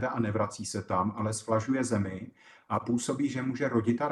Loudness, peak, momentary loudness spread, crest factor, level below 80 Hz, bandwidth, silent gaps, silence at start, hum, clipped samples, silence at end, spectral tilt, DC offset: -31 LUFS; -14 dBFS; 7 LU; 16 dB; -66 dBFS; 12.5 kHz; none; 0 s; none; under 0.1%; 0 s; -6 dB/octave; under 0.1%